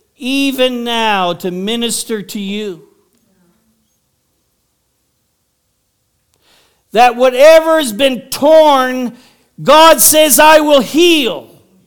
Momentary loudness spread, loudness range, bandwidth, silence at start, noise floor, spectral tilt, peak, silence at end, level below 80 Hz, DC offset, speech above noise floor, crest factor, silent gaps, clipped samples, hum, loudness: 15 LU; 16 LU; 19.5 kHz; 0.2 s; -64 dBFS; -2 dB/octave; 0 dBFS; 0.45 s; -50 dBFS; under 0.1%; 54 dB; 12 dB; none; 0.8%; none; -10 LUFS